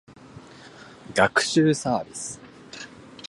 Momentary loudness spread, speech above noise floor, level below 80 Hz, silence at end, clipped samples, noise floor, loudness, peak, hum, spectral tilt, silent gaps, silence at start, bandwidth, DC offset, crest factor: 25 LU; 24 dB; -60 dBFS; 0.05 s; under 0.1%; -46 dBFS; -23 LUFS; -2 dBFS; none; -4 dB/octave; none; 0.35 s; 11.5 kHz; under 0.1%; 24 dB